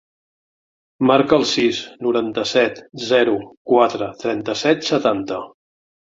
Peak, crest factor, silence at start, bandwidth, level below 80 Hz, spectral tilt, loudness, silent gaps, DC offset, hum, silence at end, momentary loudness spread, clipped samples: -2 dBFS; 18 dB; 1 s; 7.8 kHz; -60 dBFS; -4.5 dB/octave; -18 LUFS; 3.57-3.65 s; under 0.1%; none; 0.7 s; 9 LU; under 0.1%